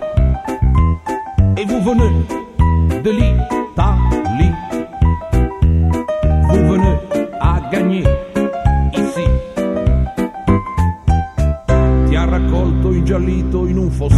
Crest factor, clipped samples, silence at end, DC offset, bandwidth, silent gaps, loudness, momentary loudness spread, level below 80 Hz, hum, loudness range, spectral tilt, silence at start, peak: 14 dB; under 0.1%; 0 s; under 0.1%; 11 kHz; none; -16 LUFS; 5 LU; -18 dBFS; none; 2 LU; -8 dB/octave; 0 s; 0 dBFS